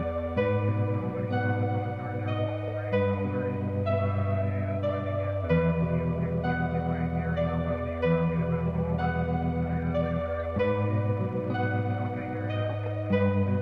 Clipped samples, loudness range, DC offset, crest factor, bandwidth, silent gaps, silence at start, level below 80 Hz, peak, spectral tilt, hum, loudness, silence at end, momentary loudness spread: under 0.1%; 1 LU; under 0.1%; 14 dB; 5.2 kHz; none; 0 s; -44 dBFS; -12 dBFS; -10 dB/octave; none; -29 LUFS; 0 s; 5 LU